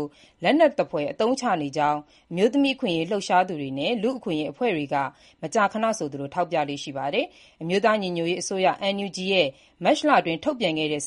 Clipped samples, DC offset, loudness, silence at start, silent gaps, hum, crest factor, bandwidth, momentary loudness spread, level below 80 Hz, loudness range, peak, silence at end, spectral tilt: under 0.1%; under 0.1%; -24 LUFS; 0 s; none; none; 18 dB; 11.5 kHz; 8 LU; -66 dBFS; 3 LU; -6 dBFS; 0 s; -4.5 dB/octave